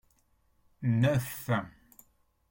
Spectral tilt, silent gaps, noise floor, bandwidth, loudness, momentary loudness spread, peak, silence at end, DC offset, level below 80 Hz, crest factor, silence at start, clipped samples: -7 dB/octave; none; -69 dBFS; 17 kHz; -30 LUFS; 9 LU; -16 dBFS; 0.8 s; under 0.1%; -62 dBFS; 18 dB; 0.8 s; under 0.1%